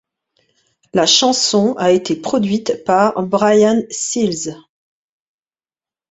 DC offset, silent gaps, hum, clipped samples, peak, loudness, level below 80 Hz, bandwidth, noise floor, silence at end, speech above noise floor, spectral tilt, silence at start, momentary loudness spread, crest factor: under 0.1%; none; none; under 0.1%; 0 dBFS; -15 LUFS; -58 dBFS; 8.4 kHz; under -90 dBFS; 1.55 s; over 75 dB; -3.5 dB/octave; 0.95 s; 8 LU; 16 dB